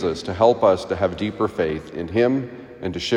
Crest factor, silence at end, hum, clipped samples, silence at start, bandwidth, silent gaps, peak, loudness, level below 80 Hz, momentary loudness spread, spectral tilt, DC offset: 18 dB; 0 s; none; under 0.1%; 0 s; 11 kHz; none; -2 dBFS; -21 LUFS; -52 dBFS; 12 LU; -6 dB/octave; under 0.1%